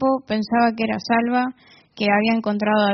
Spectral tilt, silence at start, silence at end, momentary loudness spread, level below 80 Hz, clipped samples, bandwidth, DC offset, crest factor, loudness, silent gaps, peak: -3.5 dB/octave; 0 s; 0 s; 5 LU; -60 dBFS; under 0.1%; 6.4 kHz; under 0.1%; 16 dB; -20 LUFS; none; -4 dBFS